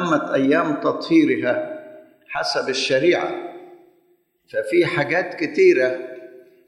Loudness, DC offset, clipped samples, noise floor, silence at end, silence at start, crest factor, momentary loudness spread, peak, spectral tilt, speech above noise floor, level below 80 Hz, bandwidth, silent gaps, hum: -20 LUFS; under 0.1%; under 0.1%; -62 dBFS; 0.3 s; 0 s; 16 dB; 16 LU; -4 dBFS; -5 dB/octave; 43 dB; -64 dBFS; 11.5 kHz; none; none